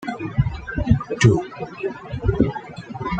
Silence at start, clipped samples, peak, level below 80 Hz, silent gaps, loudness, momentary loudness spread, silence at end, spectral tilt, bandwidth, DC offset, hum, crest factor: 0 s; under 0.1%; -2 dBFS; -34 dBFS; none; -22 LUFS; 14 LU; 0 s; -6.5 dB/octave; 9 kHz; under 0.1%; none; 20 dB